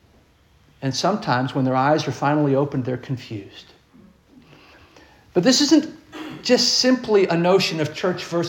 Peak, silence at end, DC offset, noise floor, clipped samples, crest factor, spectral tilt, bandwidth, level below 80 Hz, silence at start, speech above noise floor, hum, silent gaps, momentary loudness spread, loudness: -4 dBFS; 0 s; under 0.1%; -56 dBFS; under 0.1%; 18 dB; -4.5 dB/octave; 17 kHz; -60 dBFS; 0.8 s; 36 dB; none; none; 14 LU; -20 LUFS